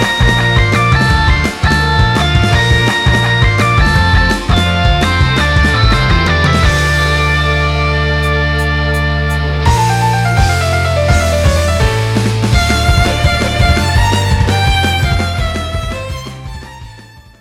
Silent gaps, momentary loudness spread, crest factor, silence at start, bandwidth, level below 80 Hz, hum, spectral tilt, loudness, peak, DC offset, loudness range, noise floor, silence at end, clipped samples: none; 5 LU; 10 dB; 0 s; 15.5 kHz; -18 dBFS; none; -5 dB/octave; -11 LUFS; 0 dBFS; under 0.1%; 2 LU; -36 dBFS; 0.2 s; under 0.1%